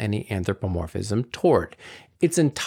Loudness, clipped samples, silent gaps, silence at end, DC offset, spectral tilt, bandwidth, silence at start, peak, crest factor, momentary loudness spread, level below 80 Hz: -24 LUFS; under 0.1%; none; 0 s; under 0.1%; -6 dB/octave; 16.5 kHz; 0 s; -8 dBFS; 16 dB; 14 LU; -50 dBFS